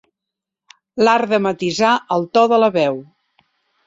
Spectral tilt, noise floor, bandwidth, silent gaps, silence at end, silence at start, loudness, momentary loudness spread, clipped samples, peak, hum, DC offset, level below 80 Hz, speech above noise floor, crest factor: -5 dB/octave; -84 dBFS; 8 kHz; none; 0.85 s; 0.95 s; -16 LUFS; 7 LU; under 0.1%; -2 dBFS; none; under 0.1%; -64 dBFS; 68 dB; 16 dB